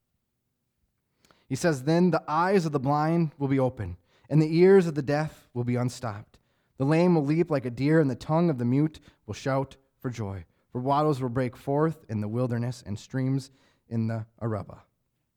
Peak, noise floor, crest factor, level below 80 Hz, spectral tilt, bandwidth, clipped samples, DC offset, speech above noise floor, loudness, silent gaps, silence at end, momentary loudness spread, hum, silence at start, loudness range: -10 dBFS; -79 dBFS; 18 dB; -60 dBFS; -7.5 dB/octave; 14 kHz; under 0.1%; under 0.1%; 53 dB; -26 LUFS; none; 0.6 s; 14 LU; none; 1.5 s; 6 LU